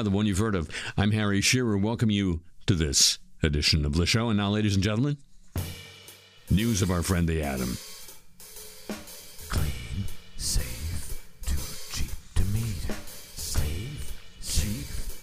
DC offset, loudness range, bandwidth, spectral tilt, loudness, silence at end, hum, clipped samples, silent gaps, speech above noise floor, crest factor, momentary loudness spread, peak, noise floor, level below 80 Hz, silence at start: under 0.1%; 10 LU; 15.5 kHz; -4 dB/octave; -27 LUFS; 0 s; none; under 0.1%; none; 25 dB; 20 dB; 19 LU; -8 dBFS; -50 dBFS; -36 dBFS; 0 s